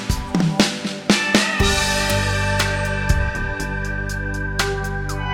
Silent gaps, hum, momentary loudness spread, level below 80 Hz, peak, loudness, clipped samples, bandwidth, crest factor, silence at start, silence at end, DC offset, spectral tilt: none; 50 Hz at -35 dBFS; 8 LU; -28 dBFS; -2 dBFS; -20 LUFS; under 0.1%; 18 kHz; 18 dB; 0 s; 0 s; under 0.1%; -4 dB/octave